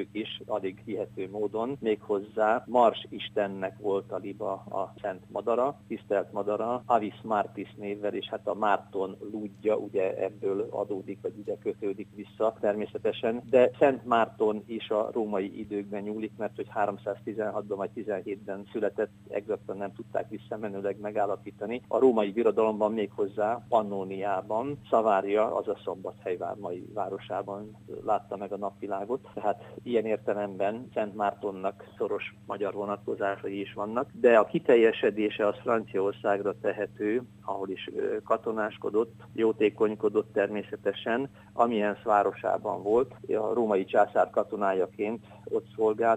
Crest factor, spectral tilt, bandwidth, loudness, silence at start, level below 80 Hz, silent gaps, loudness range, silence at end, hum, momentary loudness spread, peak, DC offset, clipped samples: 22 dB; -7 dB/octave; 9.2 kHz; -30 LUFS; 0 s; -68 dBFS; none; 7 LU; 0 s; none; 11 LU; -8 dBFS; under 0.1%; under 0.1%